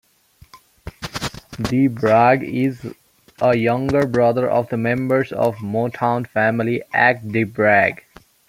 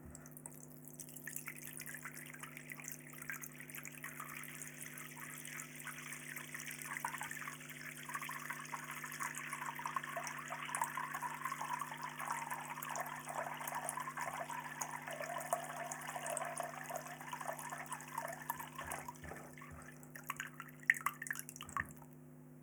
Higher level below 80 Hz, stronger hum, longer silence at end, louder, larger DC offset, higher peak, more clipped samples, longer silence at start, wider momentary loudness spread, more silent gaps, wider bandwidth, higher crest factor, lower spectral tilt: first, -50 dBFS vs -74 dBFS; neither; first, 0.55 s vs 0 s; first, -18 LUFS vs -44 LUFS; neither; first, -2 dBFS vs -14 dBFS; neither; first, 0.55 s vs 0 s; first, 13 LU vs 9 LU; neither; second, 16 kHz vs over 20 kHz; second, 18 dB vs 32 dB; first, -7 dB/octave vs -2.5 dB/octave